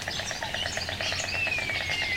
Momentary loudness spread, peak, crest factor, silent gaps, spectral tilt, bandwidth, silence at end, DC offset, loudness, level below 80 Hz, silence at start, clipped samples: 4 LU; -14 dBFS; 16 dB; none; -2 dB/octave; 16 kHz; 0 s; under 0.1%; -28 LUFS; -50 dBFS; 0 s; under 0.1%